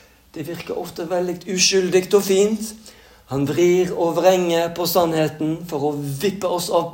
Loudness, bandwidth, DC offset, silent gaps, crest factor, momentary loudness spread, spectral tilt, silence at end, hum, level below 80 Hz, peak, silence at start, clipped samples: -20 LUFS; 17 kHz; under 0.1%; none; 18 dB; 12 LU; -4 dB/octave; 0 s; none; -56 dBFS; -2 dBFS; 0.35 s; under 0.1%